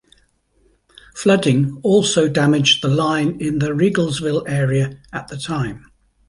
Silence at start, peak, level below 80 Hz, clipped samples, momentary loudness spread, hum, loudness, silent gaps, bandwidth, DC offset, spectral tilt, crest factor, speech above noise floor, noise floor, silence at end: 1.15 s; -2 dBFS; -50 dBFS; under 0.1%; 11 LU; none; -17 LUFS; none; 11.5 kHz; under 0.1%; -5 dB/octave; 16 dB; 42 dB; -59 dBFS; 0.5 s